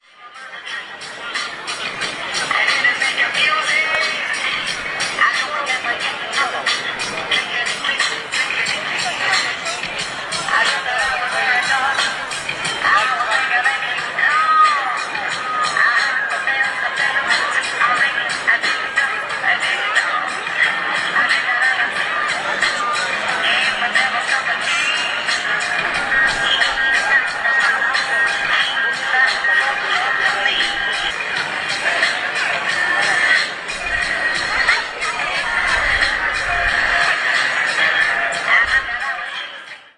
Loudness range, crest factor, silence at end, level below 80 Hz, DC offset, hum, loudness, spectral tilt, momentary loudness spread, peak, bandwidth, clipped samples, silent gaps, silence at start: 3 LU; 16 dB; 0.15 s; -46 dBFS; under 0.1%; none; -16 LUFS; -0.5 dB/octave; 7 LU; -2 dBFS; 11.5 kHz; under 0.1%; none; 0.2 s